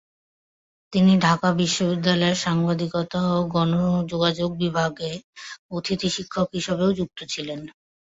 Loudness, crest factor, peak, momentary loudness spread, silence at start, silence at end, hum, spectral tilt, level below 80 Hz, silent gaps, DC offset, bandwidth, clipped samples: -23 LUFS; 18 dB; -6 dBFS; 13 LU; 0.9 s; 0.4 s; none; -5.5 dB/octave; -54 dBFS; 5.24-5.33 s, 5.59-5.69 s; under 0.1%; 8 kHz; under 0.1%